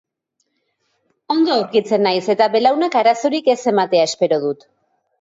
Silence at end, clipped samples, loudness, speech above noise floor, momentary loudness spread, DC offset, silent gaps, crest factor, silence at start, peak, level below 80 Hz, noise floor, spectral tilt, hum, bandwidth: 0.65 s; under 0.1%; -16 LUFS; 55 dB; 4 LU; under 0.1%; none; 16 dB; 1.3 s; -2 dBFS; -70 dBFS; -71 dBFS; -4.5 dB/octave; none; 8 kHz